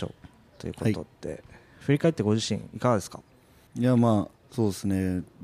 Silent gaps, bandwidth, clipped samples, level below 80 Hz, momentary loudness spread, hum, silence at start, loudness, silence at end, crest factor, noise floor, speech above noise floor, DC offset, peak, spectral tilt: none; 15 kHz; under 0.1%; -58 dBFS; 17 LU; none; 0 s; -27 LUFS; 0 s; 18 dB; -51 dBFS; 24 dB; under 0.1%; -10 dBFS; -6.5 dB/octave